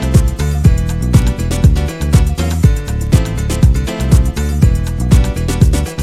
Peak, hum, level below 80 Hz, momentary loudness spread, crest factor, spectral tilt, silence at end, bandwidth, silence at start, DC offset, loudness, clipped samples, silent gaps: 0 dBFS; none; -14 dBFS; 4 LU; 12 dB; -6.5 dB/octave; 0 s; 15 kHz; 0 s; under 0.1%; -14 LUFS; 0.3%; none